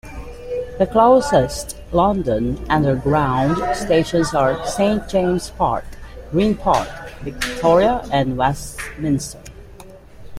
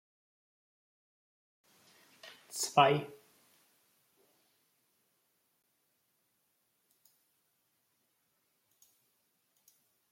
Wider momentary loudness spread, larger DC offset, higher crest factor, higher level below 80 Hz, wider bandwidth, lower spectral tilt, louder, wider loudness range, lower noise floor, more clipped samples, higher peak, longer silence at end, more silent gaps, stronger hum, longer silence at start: second, 15 LU vs 27 LU; neither; second, 16 dB vs 30 dB; first, -36 dBFS vs -86 dBFS; about the same, 16 kHz vs 16.5 kHz; first, -6 dB/octave vs -3.5 dB/octave; first, -18 LUFS vs -30 LUFS; first, 3 LU vs 0 LU; second, -40 dBFS vs -78 dBFS; neither; first, -2 dBFS vs -10 dBFS; second, 0 s vs 7.05 s; neither; neither; second, 0.05 s vs 2.25 s